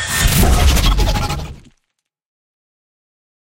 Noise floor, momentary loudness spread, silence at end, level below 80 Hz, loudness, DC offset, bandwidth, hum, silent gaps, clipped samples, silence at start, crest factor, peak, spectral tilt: -73 dBFS; 12 LU; 1.85 s; -20 dBFS; -15 LUFS; under 0.1%; 16.5 kHz; none; none; under 0.1%; 0 s; 16 dB; 0 dBFS; -4 dB/octave